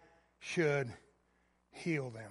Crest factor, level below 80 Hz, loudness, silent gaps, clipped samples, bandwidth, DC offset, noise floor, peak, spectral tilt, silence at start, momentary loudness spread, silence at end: 20 dB; -74 dBFS; -37 LUFS; none; under 0.1%; 11.5 kHz; under 0.1%; -74 dBFS; -20 dBFS; -6 dB/octave; 0.4 s; 21 LU; 0 s